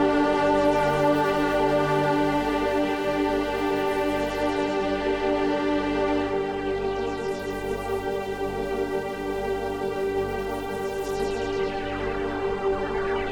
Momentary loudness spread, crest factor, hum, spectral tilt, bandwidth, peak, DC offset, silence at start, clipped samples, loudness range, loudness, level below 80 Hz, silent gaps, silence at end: 7 LU; 14 dB; 50 Hz at -50 dBFS; -6 dB/octave; 19 kHz; -10 dBFS; under 0.1%; 0 s; under 0.1%; 5 LU; -25 LUFS; -44 dBFS; none; 0 s